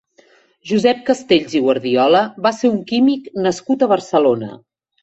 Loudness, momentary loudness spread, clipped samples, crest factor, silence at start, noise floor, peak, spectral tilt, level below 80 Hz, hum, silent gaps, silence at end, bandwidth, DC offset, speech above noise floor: -16 LUFS; 6 LU; under 0.1%; 14 dB; 0.65 s; -53 dBFS; -2 dBFS; -5.5 dB/octave; -60 dBFS; none; none; 0.5 s; 8.2 kHz; under 0.1%; 37 dB